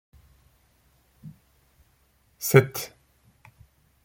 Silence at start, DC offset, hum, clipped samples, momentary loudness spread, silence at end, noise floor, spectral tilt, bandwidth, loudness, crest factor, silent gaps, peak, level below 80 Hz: 1.25 s; under 0.1%; none; under 0.1%; 29 LU; 1.15 s; -65 dBFS; -5.5 dB/octave; 16.5 kHz; -22 LUFS; 28 dB; none; -2 dBFS; -62 dBFS